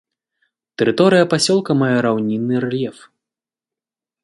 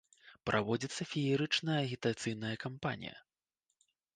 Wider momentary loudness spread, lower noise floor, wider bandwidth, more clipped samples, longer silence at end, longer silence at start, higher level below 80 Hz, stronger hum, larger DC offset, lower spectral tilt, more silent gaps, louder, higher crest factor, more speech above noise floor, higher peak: about the same, 10 LU vs 8 LU; about the same, -89 dBFS vs -86 dBFS; first, 11.5 kHz vs 9.6 kHz; neither; first, 1.3 s vs 0.95 s; first, 0.8 s vs 0.25 s; first, -62 dBFS vs -68 dBFS; neither; neither; about the same, -5 dB/octave vs -5 dB/octave; neither; first, -17 LUFS vs -36 LUFS; about the same, 18 dB vs 20 dB; first, 73 dB vs 51 dB; first, 0 dBFS vs -16 dBFS